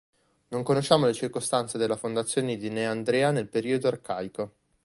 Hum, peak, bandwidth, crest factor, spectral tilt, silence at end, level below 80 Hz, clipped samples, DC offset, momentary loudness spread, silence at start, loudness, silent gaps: none; -6 dBFS; 11.5 kHz; 20 dB; -5 dB/octave; 0.35 s; -66 dBFS; under 0.1%; under 0.1%; 11 LU; 0.5 s; -27 LUFS; none